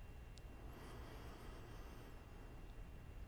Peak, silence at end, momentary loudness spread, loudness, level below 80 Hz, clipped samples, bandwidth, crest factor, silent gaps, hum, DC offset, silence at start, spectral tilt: -40 dBFS; 0 s; 3 LU; -57 LUFS; -56 dBFS; under 0.1%; over 20 kHz; 14 dB; none; none; under 0.1%; 0 s; -5.5 dB/octave